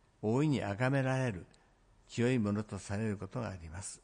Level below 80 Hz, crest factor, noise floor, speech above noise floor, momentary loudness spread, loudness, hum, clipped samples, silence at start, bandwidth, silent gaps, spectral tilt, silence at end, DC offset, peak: -64 dBFS; 16 dB; -66 dBFS; 32 dB; 12 LU; -35 LUFS; none; under 0.1%; 0.2 s; 10.5 kHz; none; -6.5 dB/octave; 0.05 s; under 0.1%; -18 dBFS